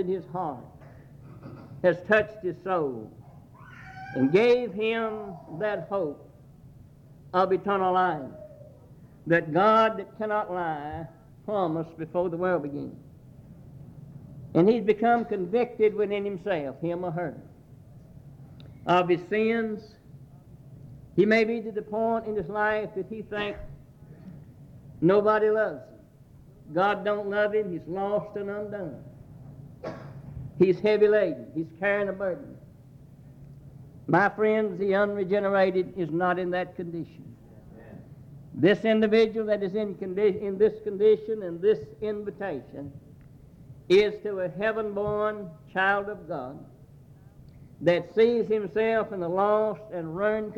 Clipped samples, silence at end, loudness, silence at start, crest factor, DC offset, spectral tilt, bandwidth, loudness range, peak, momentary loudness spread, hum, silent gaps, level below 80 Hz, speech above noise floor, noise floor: under 0.1%; 0 s; -26 LUFS; 0 s; 20 dB; under 0.1%; -7.5 dB/octave; 7.2 kHz; 5 LU; -8 dBFS; 22 LU; none; none; -60 dBFS; 26 dB; -52 dBFS